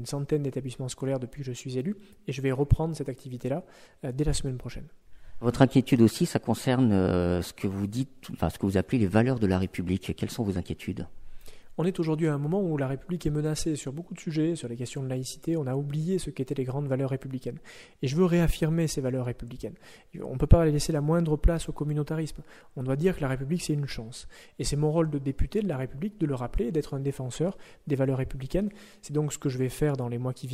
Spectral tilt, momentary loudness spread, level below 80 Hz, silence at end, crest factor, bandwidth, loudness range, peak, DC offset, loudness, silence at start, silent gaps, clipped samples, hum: -6.5 dB/octave; 13 LU; -38 dBFS; 0 s; 24 dB; 15.5 kHz; 6 LU; -2 dBFS; under 0.1%; -29 LUFS; 0 s; none; under 0.1%; none